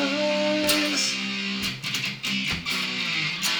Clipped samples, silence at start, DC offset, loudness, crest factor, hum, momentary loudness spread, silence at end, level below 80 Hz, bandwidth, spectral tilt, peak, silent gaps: under 0.1%; 0 s; under 0.1%; -24 LUFS; 18 dB; none; 6 LU; 0 s; -56 dBFS; over 20 kHz; -2.5 dB/octave; -8 dBFS; none